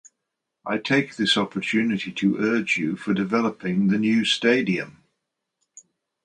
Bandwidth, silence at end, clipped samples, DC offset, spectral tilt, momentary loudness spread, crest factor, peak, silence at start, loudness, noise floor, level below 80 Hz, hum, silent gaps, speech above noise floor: 10.5 kHz; 0.45 s; under 0.1%; under 0.1%; -5 dB/octave; 7 LU; 20 dB; -4 dBFS; 0.65 s; -22 LUFS; -82 dBFS; -66 dBFS; none; none; 59 dB